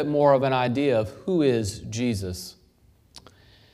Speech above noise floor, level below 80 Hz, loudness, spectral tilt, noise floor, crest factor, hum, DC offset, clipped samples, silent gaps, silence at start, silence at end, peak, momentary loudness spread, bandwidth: 36 dB; -54 dBFS; -24 LUFS; -6 dB/octave; -59 dBFS; 18 dB; none; under 0.1%; under 0.1%; none; 0 s; 0.55 s; -6 dBFS; 13 LU; 15 kHz